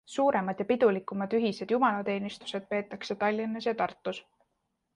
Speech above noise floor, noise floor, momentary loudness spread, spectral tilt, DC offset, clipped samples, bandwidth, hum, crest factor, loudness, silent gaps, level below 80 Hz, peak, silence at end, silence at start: 50 dB; -80 dBFS; 11 LU; -6 dB/octave; under 0.1%; under 0.1%; 10.5 kHz; none; 18 dB; -30 LUFS; none; -72 dBFS; -12 dBFS; 0.75 s; 0.1 s